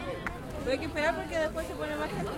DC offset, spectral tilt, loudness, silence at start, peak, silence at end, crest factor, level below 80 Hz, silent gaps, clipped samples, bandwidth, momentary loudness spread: under 0.1%; -5 dB/octave; -33 LUFS; 0 s; -16 dBFS; 0 s; 16 dB; -46 dBFS; none; under 0.1%; 16.5 kHz; 7 LU